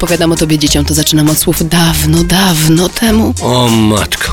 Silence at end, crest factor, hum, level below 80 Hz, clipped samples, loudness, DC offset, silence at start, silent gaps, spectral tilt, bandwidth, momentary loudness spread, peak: 0 s; 10 dB; none; -24 dBFS; under 0.1%; -9 LUFS; under 0.1%; 0 s; none; -4.5 dB/octave; over 20 kHz; 2 LU; 0 dBFS